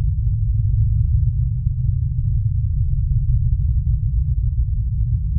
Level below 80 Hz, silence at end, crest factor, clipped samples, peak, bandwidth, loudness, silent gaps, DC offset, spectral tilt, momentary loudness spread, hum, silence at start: -20 dBFS; 0 s; 12 dB; under 0.1%; -6 dBFS; 0.3 kHz; -21 LUFS; none; under 0.1%; -18.5 dB/octave; 3 LU; none; 0 s